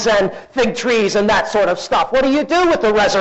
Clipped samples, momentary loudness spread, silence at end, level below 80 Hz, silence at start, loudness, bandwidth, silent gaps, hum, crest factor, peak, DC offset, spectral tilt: under 0.1%; 4 LU; 0 s; -42 dBFS; 0 s; -15 LUFS; 8.2 kHz; none; none; 8 dB; -8 dBFS; under 0.1%; -4 dB/octave